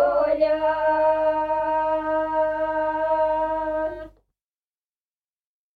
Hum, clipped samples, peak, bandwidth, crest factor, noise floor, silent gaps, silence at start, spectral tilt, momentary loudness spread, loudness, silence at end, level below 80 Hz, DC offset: none; under 0.1%; -10 dBFS; 4.9 kHz; 14 dB; under -90 dBFS; none; 0 s; -7 dB/octave; 5 LU; -22 LUFS; 1.65 s; -52 dBFS; under 0.1%